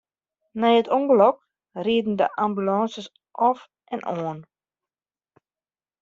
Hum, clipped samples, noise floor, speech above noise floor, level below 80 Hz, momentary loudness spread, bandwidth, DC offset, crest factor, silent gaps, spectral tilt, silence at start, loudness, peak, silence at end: none; under 0.1%; under -90 dBFS; over 68 dB; -68 dBFS; 20 LU; 7.4 kHz; under 0.1%; 20 dB; none; -4.5 dB/octave; 0.55 s; -22 LUFS; -4 dBFS; 1.6 s